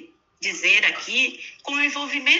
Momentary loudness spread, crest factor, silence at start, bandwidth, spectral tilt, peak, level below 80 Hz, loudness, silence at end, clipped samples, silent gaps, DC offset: 12 LU; 18 dB; 0 s; 8 kHz; 0.5 dB/octave; -6 dBFS; -78 dBFS; -20 LUFS; 0 s; under 0.1%; none; under 0.1%